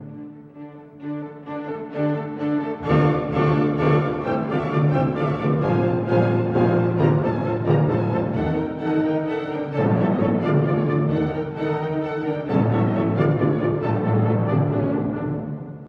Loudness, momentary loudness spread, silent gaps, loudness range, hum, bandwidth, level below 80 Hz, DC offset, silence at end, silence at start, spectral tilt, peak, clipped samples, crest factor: -22 LUFS; 11 LU; none; 2 LU; none; 5.6 kHz; -48 dBFS; under 0.1%; 0 s; 0 s; -10 dB/octave; -4 dBFS; under 0.1%; 16 dB